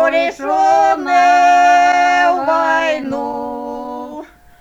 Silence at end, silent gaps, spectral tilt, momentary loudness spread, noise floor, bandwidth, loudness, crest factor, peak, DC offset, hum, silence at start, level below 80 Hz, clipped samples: 0.35 s; none; -3 dB/octave; 16 LU; -33 dBFS; 8.8 kHz; -13 LUFS; 12 dB; -2 dBFS; under 0.1%; none; 0 s; -52 dBFS; under 0.1%